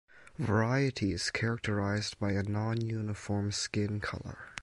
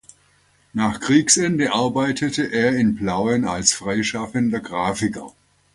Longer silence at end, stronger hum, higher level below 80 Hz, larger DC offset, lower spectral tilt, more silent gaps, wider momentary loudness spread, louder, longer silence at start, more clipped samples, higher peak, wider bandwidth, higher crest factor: second, 0 s vs 0.45 s; neither; about the same, -52 dBFS vs -50 dBFS; neither; first, -5.5 dB/octave vs -3.5 dB/octave; neither; about the same, 8 LU vs 8 LU; second, -33 LUFS vs -20 LUFS; second, 0.15 s vs 0.75 s; neither; second, -16 dBFS vs 0 dBFS; about the same, 11.5 kHz vs 11.5 kHz; about the same, 16 dB vs 20 dB